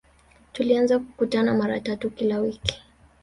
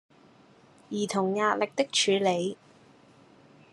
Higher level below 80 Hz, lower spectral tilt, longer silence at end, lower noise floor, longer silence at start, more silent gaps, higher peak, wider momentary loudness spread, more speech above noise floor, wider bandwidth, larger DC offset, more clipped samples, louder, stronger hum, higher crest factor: first, -50 dBFS vs -80 dBFS; first, -5.5 dB/octave vs -3.5 dB/octave; second, 0.45 s vs 1.2 s; about the same, -56 dBFS vs -57 dBFS; second, 0.55 s vs 0.9 s; neither; first, -4 dBFS vs -10 dBFS; second, 8 LU vs 11 LU; about the same, 33 dB vs 31 dB; about the same, 11.5 kHz vs 12 kHz; neither; neither; first, -24 LUFS vs -27 LUFS; neither; about the same, 22 dB vs 20 dB